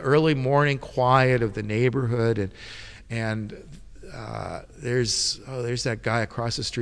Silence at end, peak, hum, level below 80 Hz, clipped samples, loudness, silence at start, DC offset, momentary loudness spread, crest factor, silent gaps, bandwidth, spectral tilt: 0 s; -6 dBFS; none; -48 dBFS; under 0.1%; -24 LUFS; 0 s; under 0.1%; 17 LU; 20 dB; none; 11 kHz; -5 dB/octave